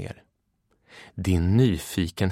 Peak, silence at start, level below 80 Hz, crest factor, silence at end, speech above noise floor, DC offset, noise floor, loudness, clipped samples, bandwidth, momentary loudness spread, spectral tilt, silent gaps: -10 dBFS; 0 s; -42 dBFS; 16 dB; 0 s; 48 dB; under 0.1%; -71 dBFS; -24 LUFS; under 0.1%; 16 kHz; 17 LU; -6.5 dB/octave; none